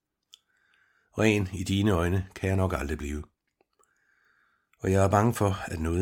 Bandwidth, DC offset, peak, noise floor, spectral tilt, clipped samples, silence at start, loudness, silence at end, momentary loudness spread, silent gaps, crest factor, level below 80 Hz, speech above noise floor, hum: 16.5 kHz; under 0.1%; -8 dBFS; -71 dBFS; -6.5 dB/octave; under 0.1%; 1.15 s; -27 LUFS; 0 s; 11 LU; none; 20 dB; -44 dBFS; 45 dB; none